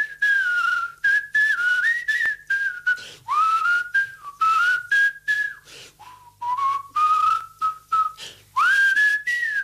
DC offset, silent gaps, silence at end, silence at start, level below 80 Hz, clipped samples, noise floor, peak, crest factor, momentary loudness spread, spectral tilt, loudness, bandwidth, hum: under 0.1%; none; 0 s; 0 s; -66 dBFS; under 0.1%; -47 dBFS; -12 dBFS; 10 dB; 9 LU; 1 dB/octave; -20 LUFS; 15.5 kHz; none